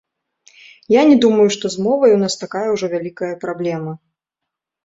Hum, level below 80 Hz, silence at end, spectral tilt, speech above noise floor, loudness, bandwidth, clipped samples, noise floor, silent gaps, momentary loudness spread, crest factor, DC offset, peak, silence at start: none; -62 dBFS; 0.9 s; -5 dB/octave; 67 dB; -16 LUFS; 8 kHz; under 0.1%; -82 dBFS; none; 14 LU; 16 dB; under 0.1%; -2 dBFS; 0.9 s